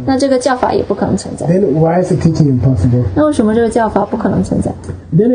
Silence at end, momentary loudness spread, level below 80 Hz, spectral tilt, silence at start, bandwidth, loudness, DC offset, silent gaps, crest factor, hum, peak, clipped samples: 0 s; 5 LU; -32 dBFS; -7.5 dB/octave; 0 s; 10 kHz; -13 LUFS; under 0.1%; none; 12 dB; none; 0 dBFS; 0.1%